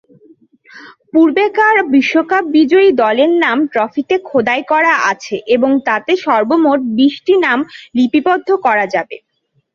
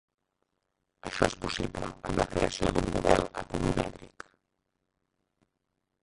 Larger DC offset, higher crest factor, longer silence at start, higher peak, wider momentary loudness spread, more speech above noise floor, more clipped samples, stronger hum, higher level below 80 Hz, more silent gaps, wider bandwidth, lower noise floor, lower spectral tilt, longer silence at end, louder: neither; second, 12 dB vs 28 dB; second, 0.75 s vs 1.05 s; first, -2 dBFS vs -6 dBFS; second, 6 LU vs 20 LU; second, 35 dB vs 52 dB; neither; neither; second, -60 dBFS vs -44 dBFS; neither; second, 7.2 kHz vs 11.5 kHz; second, -47 dBFS vs -82 dBFS; about the same, -4.5 dB/octave vs -5 dB/octave; second, 0.55 s vs 2 s; first, -13 LUFS vs -30 LUFS